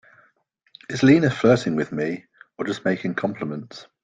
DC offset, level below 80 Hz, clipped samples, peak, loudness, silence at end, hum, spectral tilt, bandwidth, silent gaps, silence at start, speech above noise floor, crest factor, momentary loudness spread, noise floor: under 0.1%; -58 dBFS; under 0.1%; -4 dBFS; -22 LUFS; 0.2 s; none; -6.5 dB/octave; 9.2 kHz; none; 0.9 s; 44 dB; 18 dB; 18 LU; -65 dBFS